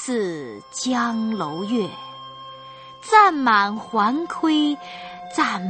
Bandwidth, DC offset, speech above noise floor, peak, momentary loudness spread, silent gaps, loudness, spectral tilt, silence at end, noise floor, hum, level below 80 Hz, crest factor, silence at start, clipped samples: 8.8 kHz; under 0.1%; 20 dB; -2 dBFS; 22 LU; none; -20 LUFS; -4 dB/octave; 0 s; -41 dBFS; none; -66 dBFS; 20 dB; 0 s; under 0.1%